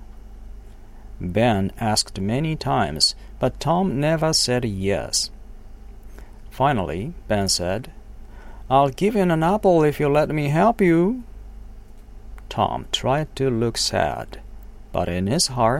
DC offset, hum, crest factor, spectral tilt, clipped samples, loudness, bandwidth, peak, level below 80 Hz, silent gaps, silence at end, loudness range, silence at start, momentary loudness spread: under 0.1%; none; 20 dB; -4.5 dB/octave; under 0.1%; -21 LUFS; 16.5 kHz; -4 dBFS; -38 dBFS; none; 0 s; 5 LU; 0 s; 11 LU